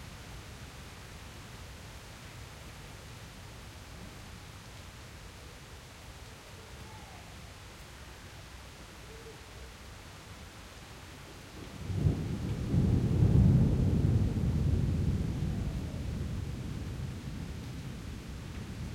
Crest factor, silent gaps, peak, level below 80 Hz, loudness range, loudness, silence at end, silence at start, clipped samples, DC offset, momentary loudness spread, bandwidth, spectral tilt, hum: 20 dB; none; -14 dBFS; -42 dBFS; 19 LU; -32 LUFS; 0 s; 0 s; under 0.1%; under 0.1%; 20 LU; 16 kHz; -7 dB/octave; none